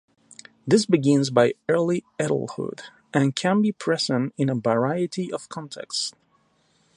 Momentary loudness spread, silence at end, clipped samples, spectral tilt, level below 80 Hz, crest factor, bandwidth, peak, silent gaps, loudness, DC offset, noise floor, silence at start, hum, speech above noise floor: 13 LU; 0.85 s; under 0.1%; -5.5 dB/octave; -68 dBFS; 20 dB; 11.5 kHz; -4 dBFS; none; -23 LUFS; under 0.1%; -65 dBFS; 0.65 s; none; 42 dB